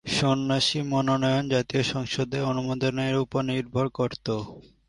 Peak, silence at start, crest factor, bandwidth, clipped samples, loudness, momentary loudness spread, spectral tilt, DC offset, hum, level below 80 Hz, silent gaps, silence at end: -10 dBFS; 0.05 s; 16 dB; 11.5 kHz; under 0.1%; -26 LUFS; 6 LU; -5.5 dB/octave; under 0.1%; none; -54 dBFS; none; 0.25 s